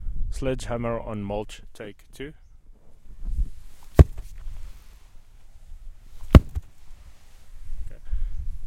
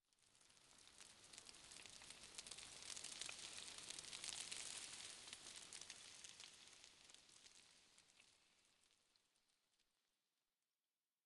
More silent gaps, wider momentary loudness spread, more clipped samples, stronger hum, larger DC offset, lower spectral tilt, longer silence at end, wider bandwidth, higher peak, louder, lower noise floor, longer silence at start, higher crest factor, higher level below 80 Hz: neither; first, 25 LU vs 16 LU; neither; neither; neither; first, -8 dB/octave vs 0.5 dB/octave; second, 0 s vs 1.45 s; first, 13 kHz vs 11.5 kHz; first, 0 dBFS vs -30 dBFS; first, -24 LUFS vs -55 LUFS; second, -45 dBFS vs under -90 dBFS; second, 0 s vs 0.2 s; second, 24 dB vs 30 dB; first, -28 dBFS vs -86 dBFS